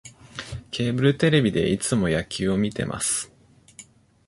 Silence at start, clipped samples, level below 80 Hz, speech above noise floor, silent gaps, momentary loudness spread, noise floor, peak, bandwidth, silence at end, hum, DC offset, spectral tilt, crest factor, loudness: 0.05 s; under 0.1%; -48 dBFS; 28 dB; none; 16 LU; -50 dBFS; -4 dBFS; 11.5 kHz; 0.45 s; none; under 0.1%; -5 dB/octave; 20 dB; -23 LUFS